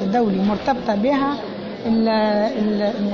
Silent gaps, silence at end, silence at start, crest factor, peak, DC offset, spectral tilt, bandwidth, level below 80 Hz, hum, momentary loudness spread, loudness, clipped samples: none; 0 s; 0 s; 12 dB; -8 dBFS; under 0.1%; -7.5 dB/octave; 6.8 kHz; -50 dBFS; none; 7 LU; -20 LUFS; under 0.1%